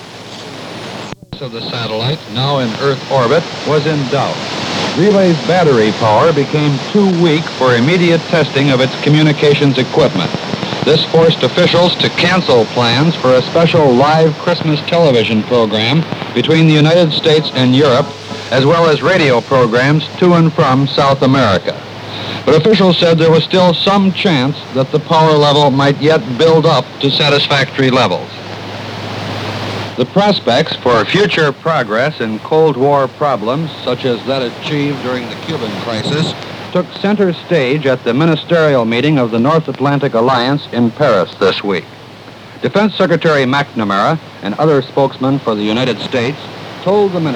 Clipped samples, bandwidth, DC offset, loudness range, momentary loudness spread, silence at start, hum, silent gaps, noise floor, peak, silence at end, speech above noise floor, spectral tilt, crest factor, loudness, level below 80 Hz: under 0.1%; 11 kHz; under 0.1%; 5 LU; 11 LU; 0 s; none; none; -33 dBFS; 0 dBFS; 0 s; 22 dB; -6 dB/octave; 12 dB; -12 LUFS; -50 dBFS